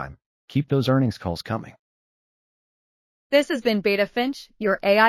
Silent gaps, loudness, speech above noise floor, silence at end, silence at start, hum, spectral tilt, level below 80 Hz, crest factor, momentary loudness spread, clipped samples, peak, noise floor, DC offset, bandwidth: 0.26-0.48 s, 1.79-3.30 s; -23 LUFS; over 68 dB; 0 s; 0 s; none; -6.5 dB/octave; -54 dBFS; 20 dB; 10 LU; under 0.1%; -4 dBFS; under -90 dBFS; under 0.1%; 15.5 kHz